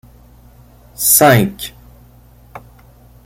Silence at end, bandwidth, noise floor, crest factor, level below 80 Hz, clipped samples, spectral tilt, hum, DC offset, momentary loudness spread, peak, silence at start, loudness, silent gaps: 0.65 s; 17 kHz; -44 dBFS; 18 dB; -44 dBFS; under 0.1%; -3.5 dB/octave; 60 Hz at -35 dBFS; under 0.1%; 21 LU; 0 dBFS; 1 s; -11 LUFS; none